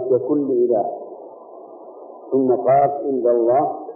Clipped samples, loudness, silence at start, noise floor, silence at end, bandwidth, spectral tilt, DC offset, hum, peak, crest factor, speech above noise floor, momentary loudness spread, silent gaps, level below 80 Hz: under 0.1%; -18 LUFS; 0 s; -39 dBFS; 0 s; 2.8 kHz; -15 dB/octave; under 0.1%; none; -6 dBFS; 14 dB; 22 dB; 23 LU; none; -66 dBFS